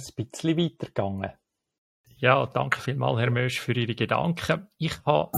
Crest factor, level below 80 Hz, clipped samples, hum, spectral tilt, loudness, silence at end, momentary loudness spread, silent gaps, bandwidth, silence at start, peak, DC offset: 22 dB; -58 dBFS; under 0.1%; none; -6 dB/octave; -26 LUFS; 0 s; 9 LU; 1.78-2.04 s; 14.5 kHz; 0 s; -4 dBFS; under 0.1%